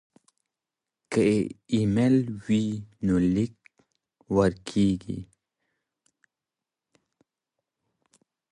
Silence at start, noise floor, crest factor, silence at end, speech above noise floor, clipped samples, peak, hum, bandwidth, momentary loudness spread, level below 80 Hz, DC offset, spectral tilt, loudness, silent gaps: 1.1 s; -89 dBFS; 20 dB; 3.3 s; 65 dB; under 0.1%; -8 dBFS; none; 11 kHz; 9 LU; -52 dBFS; under 0.1%; -7.5 dB/octave; -25 LUFS; none